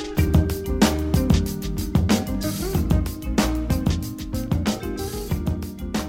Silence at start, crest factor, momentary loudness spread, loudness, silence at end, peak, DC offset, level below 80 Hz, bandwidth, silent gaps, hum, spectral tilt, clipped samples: 0 s; 18 dB; 8 LU; -23 LUFS; 0 s; -4 dBFS; 0.2%; -28 dBFS; 17 kHz; none; none; -6 dB/octave; under 0.1%